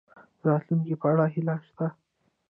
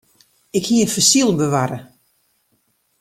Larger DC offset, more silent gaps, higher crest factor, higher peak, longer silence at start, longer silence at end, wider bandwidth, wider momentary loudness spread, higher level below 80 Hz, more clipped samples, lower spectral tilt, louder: neither; neither; about the same, 18 dB vs 18 dB; second, -10 dBFS vs -2 dBFS; about the same, 0.45 s vs 0.55 s; second, 0.6 s vs 1.15 s; second, 3.2 kHz vs 16.5 kHz; second, 9 LU vs 12 LU; second, -74 dBFS vs -56 dBFS; neither; first, -13 dB/octave vs -3.5 dB/octave; second, -27 LUFS vs -16 LUFS